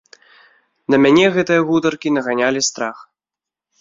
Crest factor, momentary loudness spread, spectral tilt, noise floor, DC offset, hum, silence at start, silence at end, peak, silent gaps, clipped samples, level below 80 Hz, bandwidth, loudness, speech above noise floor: 16 dB; 12 LU; -4 dB/octave; -87 dBFS; under 0.1%; none; 0.9 s; 0.8 s; -2 dBFS; none; under 0.1%; -58 dBFS; 7.8 kHz; -16 LUFS; 72 dB